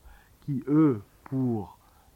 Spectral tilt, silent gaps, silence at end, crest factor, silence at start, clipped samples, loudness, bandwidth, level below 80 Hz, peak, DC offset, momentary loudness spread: -10.5 dB/octave; none; 0.45 s; 16 dB; 0.45 s; under 0.1%; -28 LUFS; 4.2 kHz; -60 dBFS; -12 dBFS; under 0.1%; 16 LU